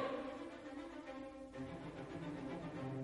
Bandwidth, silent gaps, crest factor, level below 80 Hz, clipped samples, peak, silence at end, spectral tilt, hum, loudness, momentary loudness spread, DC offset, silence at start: 11.5 kHz; none; 16 dB; -68 dBFS; under 0.1%; -30 dBFS; 0 s; -7 dB/octave; none; -48 LUFS; 5 LU; under 0.1%; 0 s